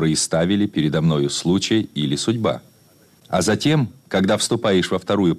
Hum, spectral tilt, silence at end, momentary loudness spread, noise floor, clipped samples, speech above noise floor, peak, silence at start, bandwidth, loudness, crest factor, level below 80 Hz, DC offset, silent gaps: none; -5 dB/octave; 0 s; 4 LU; -53 dBFS; under 0.1%; 34 dB; -8 dBFS; 0 s; 14.5 kHz; -20 LUFS; 12 dB; -52 dBFS; under 0.1%; none